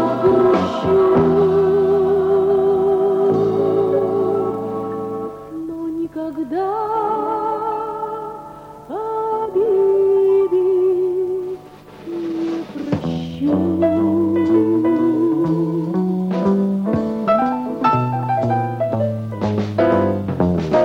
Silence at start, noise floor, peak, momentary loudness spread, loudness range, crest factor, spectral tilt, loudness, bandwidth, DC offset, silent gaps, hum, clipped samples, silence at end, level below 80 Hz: 0 s; -39 dBFS; -4 dBFS; 11 LU; 7 LU; 12 dB; -9 dB/octave; -18 LUFS; 6.8 kHz; under 0.1%; none; none; under 0.1%; 0 s; -48 dBFS